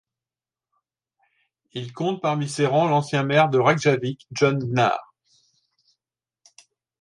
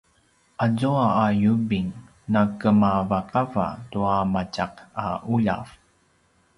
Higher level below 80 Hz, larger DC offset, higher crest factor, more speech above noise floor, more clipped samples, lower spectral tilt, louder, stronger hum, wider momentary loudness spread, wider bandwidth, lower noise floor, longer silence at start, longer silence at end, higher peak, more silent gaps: second, -66 dBFS vs -50 dBFS; neither; about the same, 20 dB vs 18 dB; first, over 69 dB vs 41 dB; neither; second, -6 dB/octave vs -8 dB/octave; about the same, -21 LUFS vs -23 LUFS; neither; about the same, 12 LU vs 11 LU; about the same, 11.5 kHz vs 11 kHz; first, under -90 dBFS vs -63 dBFS; first, 1.75 s vs 0.6 s; first, 2 s vs 0.9 s; about the same, -4 dBFS vs -6 dBFS; neither